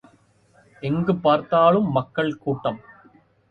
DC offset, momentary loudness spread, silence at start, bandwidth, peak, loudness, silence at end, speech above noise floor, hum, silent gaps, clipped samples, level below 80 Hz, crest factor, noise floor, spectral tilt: under 0.1%; 12 LU; 0.8 s; 6.4 kHz; -4 dBFS; -21 LUFS; 0.75 s; 37 dB; none; none; under 0.1%; -58 dBFS; 20 dB; -58 dBFS; -9 dB/octave